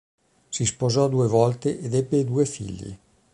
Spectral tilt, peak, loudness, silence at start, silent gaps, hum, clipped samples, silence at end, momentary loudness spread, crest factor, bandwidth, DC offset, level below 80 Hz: -6 dB/octave; -4 dBFS; -23 LUFS; 0.5 s; none; none; under 0.1%; 0.35 s; 14 LU; 20 dB; 11.5 kHz; under 0.1%; -52 dBFS